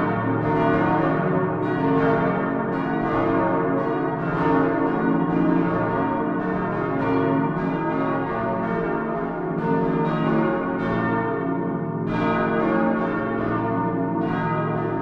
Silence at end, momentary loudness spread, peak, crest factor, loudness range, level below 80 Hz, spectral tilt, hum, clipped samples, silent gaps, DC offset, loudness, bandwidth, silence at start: 0 s; 4 LU; -8 dBFS; 14 dB; 2 LU; -46 dBFS; -10 dB/octave; none; under 0.1%; none; under 0.1%; -23 LUFS; 6 kHz; 0 s